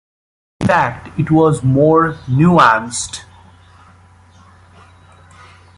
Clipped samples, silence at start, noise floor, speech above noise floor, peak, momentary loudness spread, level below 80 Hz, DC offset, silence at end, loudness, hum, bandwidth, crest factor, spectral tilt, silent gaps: under 0.1%; 0.6 s; -45 dBFS; 32 dB; 0 dBFS; 12 LU; -44 dBFS; under 0.1%; 2.55 s; -14 LUFS; none; 11.5 kHz; 16 dB; -6 dB/octave; none